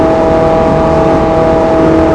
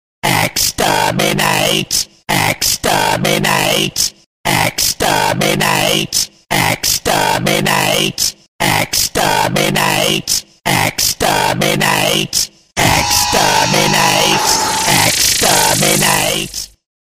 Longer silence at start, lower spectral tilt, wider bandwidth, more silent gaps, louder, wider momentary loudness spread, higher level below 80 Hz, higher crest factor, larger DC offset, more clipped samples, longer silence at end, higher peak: second, 0 s vs 0.25 s; first, -8 dB/octave vs -2 dB/octave; second, 10.5 kHz vs 16 kHz; second, none vs 4.26-4.44 s, 8.48-8.59 s; first, -9 LUFS vs -12 LUFS; second, 1 LU vs 6 LU; first, -24 dBFS vs -38 dBFS; second, 8 dB vs 14 dB; neither; first, 1% vs under 0.1%; second, 0 s vs 0.45 s; about the same, 0 dBFS vs 0 dBFS